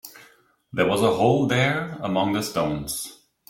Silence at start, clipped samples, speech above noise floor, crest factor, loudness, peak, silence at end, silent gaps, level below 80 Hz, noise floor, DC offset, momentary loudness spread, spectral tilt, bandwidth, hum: 0.05 s; under 0.1%; 34 dB; 20 dB; -23 LUFS; -4 dBFS; 0.35 s; none; -54 dBFS; -57 dBFS; under 0.1%; 12 LU; -5 dB/octave; 16.5 kHz; none